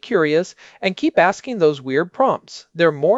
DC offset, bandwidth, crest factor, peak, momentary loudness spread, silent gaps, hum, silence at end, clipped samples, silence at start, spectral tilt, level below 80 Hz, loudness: under 0.1%; 8 kHz; 16 dB; -2 dBFS; 9 LU; none; none; 0 s; under 0.1%; 0.05 s; -5.5 dB/octave; -66 dBFS; -19 LUFS